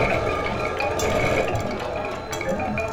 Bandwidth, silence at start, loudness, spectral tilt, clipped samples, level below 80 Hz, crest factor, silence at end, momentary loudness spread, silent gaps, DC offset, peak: 18 kHz; 0 s; -24 LUFS; -5 dB/octave; under 0.1%; -38 dBFS; 16 dB; 0 s; 7 LU; none; under 0.1%; -8 dBFS